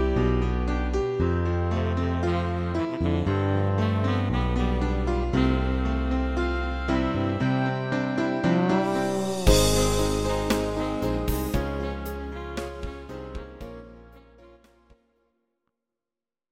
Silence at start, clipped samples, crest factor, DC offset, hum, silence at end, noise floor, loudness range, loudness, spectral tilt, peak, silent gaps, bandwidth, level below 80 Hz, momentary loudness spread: 0 s; under 0.1%; 22 dB; under 0.1%; none; 2.05 s; under -90 dBFS; 14 LU; -26 LUFS; -6 dB/octave; -4 dBFS; none; 16.5 kHz; -32 dBFS; 11 LU